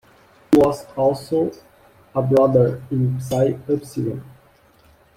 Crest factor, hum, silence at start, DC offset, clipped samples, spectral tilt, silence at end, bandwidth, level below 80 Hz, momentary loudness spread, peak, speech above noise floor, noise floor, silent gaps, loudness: 18 dB; none; 0.5 s; under 0.1%; under 0.1%; -8 dB/octave; 0.95 s; 16 kHz; -52 dBFS; 11 LU; -2 dBFS; 34 dB; -53 dBFS; none; -20 LUFS